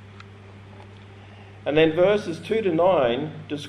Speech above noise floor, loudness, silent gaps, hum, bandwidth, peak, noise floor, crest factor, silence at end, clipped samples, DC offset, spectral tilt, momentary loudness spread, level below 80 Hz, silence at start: 23 dB; -22 LUFS; none; none; 11 kHz; -6 dBFS; -44 dBFS; 18 dB; 0 s; under 0.1%; under 0.1%; -6.5 dB/octave; 11 LU; -56 dBFS; 0 s